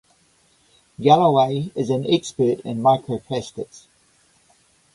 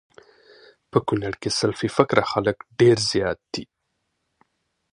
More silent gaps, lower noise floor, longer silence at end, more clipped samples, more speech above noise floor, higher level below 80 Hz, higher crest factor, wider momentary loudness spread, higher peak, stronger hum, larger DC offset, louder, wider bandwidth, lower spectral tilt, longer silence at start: neither; second, -60 dBFS vs -75 dBFS; second, 1.15 s vs 1.3 s; neither; second, 40 dB vs 54 dB; second, -60 dBFS vs -54 dBFS; about the same, 20 dB vs 24 dB; first, 14 LU vs 10 LU; about the same, 0 dBFS vs 0 dBFS; neither; neither; about the same, -20 LUFS vs -22 LUFS; about the same, 11.5 kHz vs 11.5 kHz; first, -6.5 dB/octave vs -5 dB/octave; about the same, 1 s vs 0.95 s